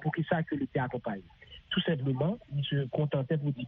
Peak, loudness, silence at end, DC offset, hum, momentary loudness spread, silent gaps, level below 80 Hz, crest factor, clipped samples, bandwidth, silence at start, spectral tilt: -14 dBFS; -32 LUFS; 0 s; under 0.1%; none; 9 LU; none; -62 dBFS; 18 dB; under 0.1%; 4 kHz; 0 s; -5.5 dB/octave